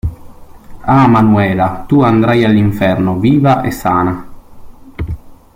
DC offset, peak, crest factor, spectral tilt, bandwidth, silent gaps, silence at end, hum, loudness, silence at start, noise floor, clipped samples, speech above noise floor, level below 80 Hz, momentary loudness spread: under 0.1%; 0 dBFS; 12 dB; -8 dB/octave; 16.5 kHz; none; 0.2 s; none; -11 LUFS; 0.05 s; -33 dBFS; under 0.1%; 23 dB; -34 dBFS; 16 LU